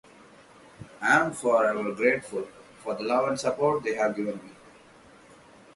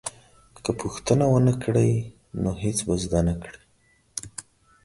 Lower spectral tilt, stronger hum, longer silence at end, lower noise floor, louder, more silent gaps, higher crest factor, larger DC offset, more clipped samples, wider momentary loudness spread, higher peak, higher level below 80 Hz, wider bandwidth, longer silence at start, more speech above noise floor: second, -4.5 dB/octave vs -6 dB/octave; neither; first, 1.25 s vs 0.45 s; second, -53 dBFS vs -63 dBFS; about the same, -26 LUFS vs -24 LUFS; neither; about the same, 20 dB vs 20 dB; neither; neither; second, 13 LU vs 16 LU; about the same, -8 dBFS vs -6 dBFS; second, -68 dBFS vs -42 dBFS; about the same, 11.5 kHz vs 11.5 kHz; first, 0.8 s vs 0.05 s; second, 28 dB vs 40 dB